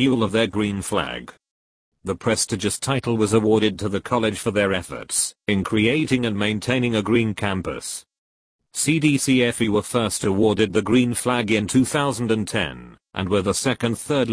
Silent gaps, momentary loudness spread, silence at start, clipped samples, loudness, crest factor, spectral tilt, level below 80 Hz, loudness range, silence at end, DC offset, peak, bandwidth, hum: 1.51-1.92 s, 8.18-8.59 s; 8 LU; 0 s; under 0.1%; -21 LUFS; 18 dB; -4.5 dB/octave; -50 dBFS; 3 LU; 0 s; under 0.1%; -4 dBFS; 11 kHz; none